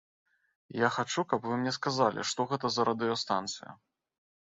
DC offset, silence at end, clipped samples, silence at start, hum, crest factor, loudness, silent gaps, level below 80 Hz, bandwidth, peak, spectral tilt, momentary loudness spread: under 0.1%; 0.75 s; under 0.1%; 0.7 s; none; 22 dB; -31 LUFS; none; -72 dBFS; 8.2 kHz; -12 dBFS; -4 dB/octave; 9 LU